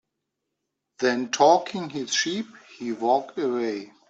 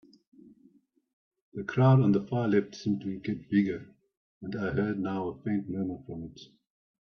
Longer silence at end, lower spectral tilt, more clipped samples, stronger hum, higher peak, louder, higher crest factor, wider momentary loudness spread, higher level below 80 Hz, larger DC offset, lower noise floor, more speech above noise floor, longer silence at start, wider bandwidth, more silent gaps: second, 0.25 s vs 0.7 s; second, -3 dB/octave vs -9 dB/octave; neither; neither; first, -6 dBFS vs -10 dBFS; first, -24 LUFS vs -29 LUFS; about the same, 20 dB vs 20 dB; second, 14 LU vs 18 LU; second, -76 dBFS vs -64 dBFS; neither; first, -81 dBFS vs -64 dBFS; first, 57 dB vs 35 dB; second, 1 s vs 1.55 s; first, 8 kHz vs 6.6 kHz; second, none vs 4.17-4.41 s